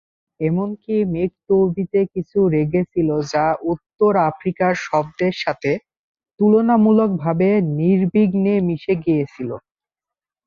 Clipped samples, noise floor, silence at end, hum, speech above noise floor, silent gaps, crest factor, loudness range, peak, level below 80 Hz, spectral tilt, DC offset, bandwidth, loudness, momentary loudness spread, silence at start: under 0.1%; -89 dBFS; 0.85 s; none; 71 dB; 5.97-6.15 s; 14 dB; 3 LU; -4 dBFS; -52 dBFS; -8 dB/octave; under 0.1%; 7.2 kHz; -19 LUFS; 8 LU; 0.4 s